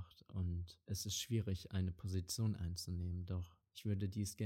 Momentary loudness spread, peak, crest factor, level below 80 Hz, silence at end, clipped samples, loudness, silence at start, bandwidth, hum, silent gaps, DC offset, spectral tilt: 7 LU; -28 dBFS; 14 dB; -58 dBFS; 0 s; under 0.1%; -43 LUFS; 0 s; 16.5 kHz; none; none; under 0.1%; -5 dB/octave